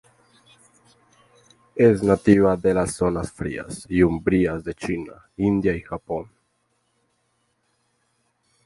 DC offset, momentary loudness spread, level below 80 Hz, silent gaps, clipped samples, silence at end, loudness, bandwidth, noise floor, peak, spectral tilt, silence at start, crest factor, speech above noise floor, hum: under 0.1%; 14 LU; -46 dBFS; none; under 0.1%; 2.45 s; -22 LUFS; 11.5 kHz; -70 dBFS; -2 dBFS; -7 dB/octave; 1.75 s; 22 dB; 49 dB; none